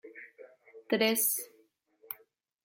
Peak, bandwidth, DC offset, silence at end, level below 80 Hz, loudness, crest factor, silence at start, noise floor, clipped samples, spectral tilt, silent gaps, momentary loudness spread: -14 dBFS; 16.5 kHz; under 0.1%; 0.5 s; -84 dBFS; -29 LUFS; 22 dB; 0.05 s; -68 dBFS; under 0.1%; -2 dB/octave; none; 23 LU